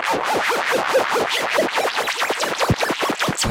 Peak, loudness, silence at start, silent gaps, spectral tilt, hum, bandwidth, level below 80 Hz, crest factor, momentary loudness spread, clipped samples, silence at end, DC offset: -6 dBFS; -19 LUFS; 0 s; none; -3 dB/octave; none; 16 kHz; -48 dBFS; 14 dB; 2 LU; under 0.1%; 0 s; under 0.1%